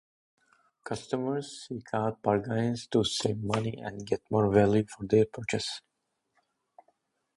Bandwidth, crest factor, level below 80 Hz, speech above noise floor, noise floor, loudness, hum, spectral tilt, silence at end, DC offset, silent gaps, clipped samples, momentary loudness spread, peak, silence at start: 11.5 kHz; 22 dB; -58 dBFS; 47 dB; -76 dBFS; -29 LUFS; none; -5.5 dB/octave; 1.55 s; under 0.1%; none; under 0.1%; 14 LU; -8 dBFS; 0.85 s